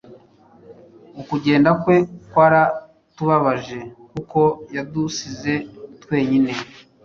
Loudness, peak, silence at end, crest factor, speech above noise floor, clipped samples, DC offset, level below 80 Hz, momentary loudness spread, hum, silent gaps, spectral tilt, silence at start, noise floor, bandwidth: -19 LUFS; -2 dBFS; 0.4 s; 18 dB; 32 dB; under 0.1%; under 0.1%; -56 dBFS; 18 LU; none; none; -6.5 dB/octave; 0.1 s; -50 dBFS; 7.2 kHz